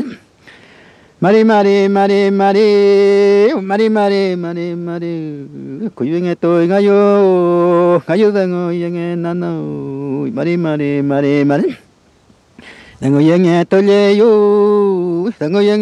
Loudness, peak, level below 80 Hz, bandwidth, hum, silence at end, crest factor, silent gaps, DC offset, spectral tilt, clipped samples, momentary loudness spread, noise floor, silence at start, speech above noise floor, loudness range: -13 LUFS; 0 dBFS; -60 dBFS; 9.4 kHz; none; 0 s; 12 dB; none; under 0.1%; -7.5 dB/octave; under 0.1%; 12 LU; -50 dBFS; 0 s; 38 dB; 6 LU